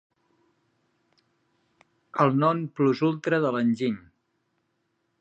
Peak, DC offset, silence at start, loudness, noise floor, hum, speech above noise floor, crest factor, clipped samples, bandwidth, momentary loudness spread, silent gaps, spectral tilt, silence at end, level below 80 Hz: -6 dBFS; under 0.1%; 2.15 s; -25 LUFS; -75 dBFS; none; 51 dB; 22 dB; under 0.1%; 8.2 kHz; 8 LU; none; -8 dB/octave; 1.2 s; -74 dBFS